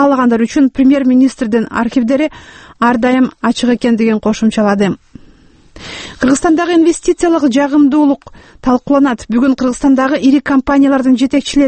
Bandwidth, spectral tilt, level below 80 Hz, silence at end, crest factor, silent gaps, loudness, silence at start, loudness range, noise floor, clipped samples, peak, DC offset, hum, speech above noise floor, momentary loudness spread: 8.8 kHz; -5 dB/octave; -40 dBFS; 0 s; 12 dB; none; -12 LUFS; 0 s; 2 LU; -43 dBFS; under 0.1%; 0 dBFS; under 0.1%; none; 32 dB; 5 LU